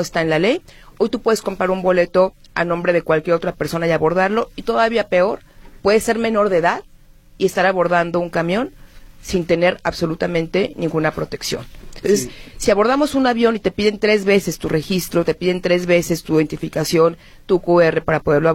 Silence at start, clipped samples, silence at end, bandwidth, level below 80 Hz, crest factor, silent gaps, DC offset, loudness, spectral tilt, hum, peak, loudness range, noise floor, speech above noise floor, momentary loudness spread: 0 s; under 0.1%; 0 s; 16.5 kHz; -42 dBFS; 16 dB; none; under 0.1%; -18 LUFS; -5 dB/octave; none; -2 dBFS; 3 LU; -45 dBFS; 28 dB; 7 LU